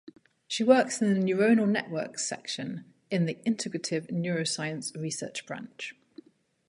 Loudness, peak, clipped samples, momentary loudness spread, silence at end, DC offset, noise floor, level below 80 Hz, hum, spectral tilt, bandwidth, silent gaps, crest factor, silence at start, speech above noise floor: -28 LUFS; -8 dBFS; under 0.1%; 15 LU; 0.8 s; under 0.1%; -54 dBFS; -76 dBFS; none; -4.5 dB/octave; 11.5 kHz; none; 22 dB; 0.05 s; 25 dB